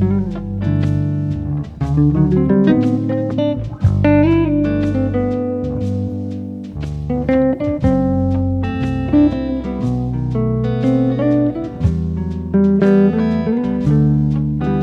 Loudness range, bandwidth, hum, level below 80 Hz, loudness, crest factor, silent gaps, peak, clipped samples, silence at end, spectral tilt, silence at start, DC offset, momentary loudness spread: 4 LU; 6.8 kHz; none; -32 dBFS; -17 LUFS; 14 dB; none; -2 dBFS; under 0.1%; 0 s; -10 dB/octave; 0 s; under 0.1%; 9 LU